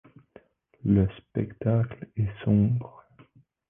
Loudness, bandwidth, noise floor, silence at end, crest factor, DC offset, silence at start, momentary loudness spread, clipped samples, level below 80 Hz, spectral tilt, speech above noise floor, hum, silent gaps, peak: -27 LUFS; 3.7 kHz; -58 dBFS; 0.8 s; 16 dB; under 0.1%; 0.85 s; 9 LU; under 0.1%; -46 dBFS; -12.5 dB/octave; 33 dB; none; none; -10 dBFS